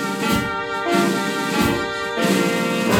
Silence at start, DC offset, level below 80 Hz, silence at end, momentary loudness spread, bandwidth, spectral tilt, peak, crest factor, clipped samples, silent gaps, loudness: 0 s; under 0.1%; -44 dBFS; 0 s; 4 LU; 19 kHz; -4.5 dB/octave; -6 dBFS; 14 dB; under 0.1%; none; -20 LUFS